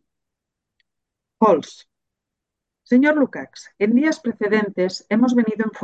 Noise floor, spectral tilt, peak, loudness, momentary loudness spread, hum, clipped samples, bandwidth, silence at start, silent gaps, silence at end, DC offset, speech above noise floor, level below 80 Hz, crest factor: -83 dBFS; -6 dB/octave; -4 dBFS; -19 LUFS; 7 LU; none; under 0.1%; 8 kHz; 1.4 s; none; 0 s; under 0.1%; 65 dB; -70 dBFS; 18 dB